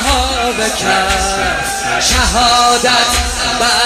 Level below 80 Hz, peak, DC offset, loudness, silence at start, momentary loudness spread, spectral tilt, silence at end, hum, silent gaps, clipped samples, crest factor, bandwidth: -24 dBFS; 0 dBFS; under 0.1%; -12 LUFS; 0 s; 5 LU; -2 dB/octave; 0 s; none; none; under 0.1%; 12 dB; 15.5 kHz